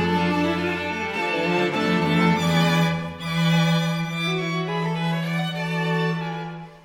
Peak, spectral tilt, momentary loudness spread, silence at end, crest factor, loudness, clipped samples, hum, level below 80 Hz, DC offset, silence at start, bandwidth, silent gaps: -8 dBFS; -6 dB/octave; 6 LU; 0.05 s; 14 dB; -23 LUFS; under 0.1%; none; -56 dBFS; under 0.1%; 0 s; 16 kHz; none